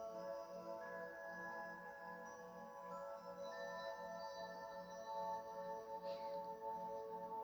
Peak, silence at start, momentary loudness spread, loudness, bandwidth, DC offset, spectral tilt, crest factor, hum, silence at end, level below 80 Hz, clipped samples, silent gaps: -36 dBFS; 0 s; 5 LU; -50 LUFS; over 20 kHz; under 0.1%; -4.5 dB/octave; 14 dB; none; 0 s; -84 dBFS; under 0.1%; none